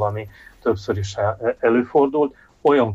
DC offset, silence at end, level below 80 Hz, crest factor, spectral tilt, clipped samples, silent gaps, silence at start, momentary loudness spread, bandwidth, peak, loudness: under 0.1%; 0 s; -52 dBFS; 14 dB; -7 dB/octave; under 0.1%; none; 0 s; 8 LU; 7.8 kHz; -6 dBFS; -21 LUFS